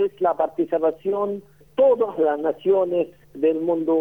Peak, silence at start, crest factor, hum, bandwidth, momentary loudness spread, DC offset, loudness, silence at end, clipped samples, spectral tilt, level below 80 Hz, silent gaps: -8 dBFS; 0 s; 12 dB; none; 3.7 kHz; 8 LU; 0.1%; -22 LUFS; 0 s; under 0.1%; -8.5 dB/octave; -64 dBFS; none